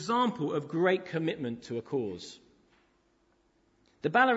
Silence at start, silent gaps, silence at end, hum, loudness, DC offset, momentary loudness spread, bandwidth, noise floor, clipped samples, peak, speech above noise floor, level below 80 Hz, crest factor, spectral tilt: 0 s; none; 0 s; none; -31 LUFS; under 0.1%; 10 LU; 8 kHz; -70 dBFS; under 0.1%; -12 dBFS; 40 dB; -72 dBFS; 20 dB; -6 dB/octave